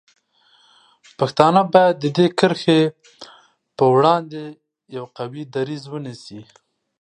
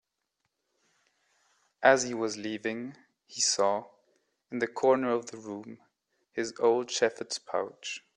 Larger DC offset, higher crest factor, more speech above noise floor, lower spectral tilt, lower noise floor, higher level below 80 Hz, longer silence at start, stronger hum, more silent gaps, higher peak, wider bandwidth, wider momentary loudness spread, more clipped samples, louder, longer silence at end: neither; second, 20 dB vs 26 dB; second, 39 dB vs 53 dB; first, -6.5 dB/octave vs -2.5 dB/octave; second, -58 dBFS vs -82 dBFS; first, -66 dBFS vs -78 dBFS; second, 1.2 s vs 1.8 s; neither; neither; first, 0 dBFS vs -6 dBFS; about the same, 10.5 kHz vs 11 kHz; first, 20 LU vs 16 LU; neither; first, -17 LUFS vs -29 LUFS; first, 0.6 s vs 0.15 s